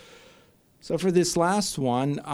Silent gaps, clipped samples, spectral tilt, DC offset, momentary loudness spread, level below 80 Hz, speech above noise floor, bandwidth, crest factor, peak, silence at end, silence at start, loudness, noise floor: none; under 0.1%; -5 dB/octave; under 0.1%; 5 LU; -58 dBFS; 34 dB; 16 kHz; 18 dB; -8 dBFS; 0 s; 0.85 s; -24 LUFS; -58 dBFS